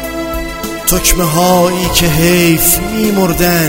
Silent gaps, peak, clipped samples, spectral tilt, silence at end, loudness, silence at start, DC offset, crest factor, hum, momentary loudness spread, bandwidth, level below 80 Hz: none; 0 dBFS; 0.2%; -4 dB/octave; 0 s; -11 LUFS; 0 s; under 0.1%; 12 dB; none; 11 LU; over 20 kHz; -24 dBFS